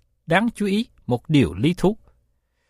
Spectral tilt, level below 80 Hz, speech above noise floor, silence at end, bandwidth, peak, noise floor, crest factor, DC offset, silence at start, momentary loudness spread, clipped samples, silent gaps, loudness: -6.5 dB/octave; -44 dBFS; 47 dB; 0.75 s; 15 kHz; -2 dBFS; -68 dBFS; 20 dB; under 0.1%; 0.3 s; 7 LU; under 0.1%; none; -21 LUFS